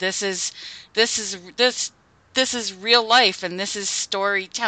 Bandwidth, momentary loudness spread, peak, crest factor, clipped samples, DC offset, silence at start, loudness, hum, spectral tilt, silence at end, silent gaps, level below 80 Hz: 9.4 kHz; 12 LU; -2 dBFS; 20 dB; under 0.1%; under 0.1%; 0 s; -21 LUFS; none; -0.5 dB/octave; 0 s; none; -64 dBFS